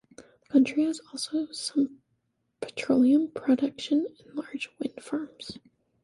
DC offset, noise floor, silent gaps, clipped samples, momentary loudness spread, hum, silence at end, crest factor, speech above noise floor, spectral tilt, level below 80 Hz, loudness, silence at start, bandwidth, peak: under 0.1%; -75 dBFS; none; under 0.1%; 16 LU; none; 0.45 s; 18 dB; 48 dB; -4 dB/octave; -70 dBFS; -28 LUFS; 0.2 s; 11.5 kHz; -10 dBFS